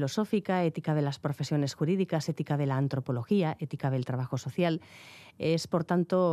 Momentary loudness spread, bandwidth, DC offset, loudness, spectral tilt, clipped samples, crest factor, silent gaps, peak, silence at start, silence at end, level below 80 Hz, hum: 6 LU; 14 kHz; under 0.1%; -30 LUFS; -7 dB/octave; under 0.1%; 14 dB; none; -14 dBFS; 0 s; 0 s; -72 dBFS; none